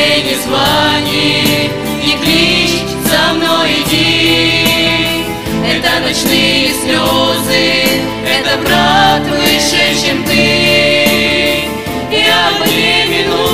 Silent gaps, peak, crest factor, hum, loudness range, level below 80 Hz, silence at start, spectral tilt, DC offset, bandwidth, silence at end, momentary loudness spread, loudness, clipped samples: none; 0 dBFS; 12 dB; none; 1 LU; -34 dBFS; 0 s; -3 dB/octave; 1%; 16.5 kHz; 0 s; 5 LU; -10 LUFS; under 0.1%